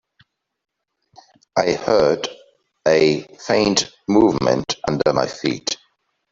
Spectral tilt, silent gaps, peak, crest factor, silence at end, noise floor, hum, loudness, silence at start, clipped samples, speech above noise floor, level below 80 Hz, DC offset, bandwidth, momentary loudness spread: -4.5 dB/octave; none; -2 dBFS; 18 dB; 0.55 s; -64 dBFS; none; -19 LUFS; 1.55 s; under 0.1%; 47 dB; -52 dBFS; under 0.1%; 7.8 kHz; 9 LU